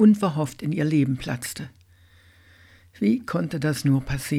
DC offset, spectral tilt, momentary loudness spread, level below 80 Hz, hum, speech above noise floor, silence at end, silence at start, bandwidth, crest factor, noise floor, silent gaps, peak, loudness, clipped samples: under 0.1%; -6.5 dB/octave; 9 LU; -48 dBFS; none; 32 dB; 0 s; 0 s; 15.5 kHz; 16 dB; -55 dBFS; none; -8 dBFS; -24 LUFS; under 0.1%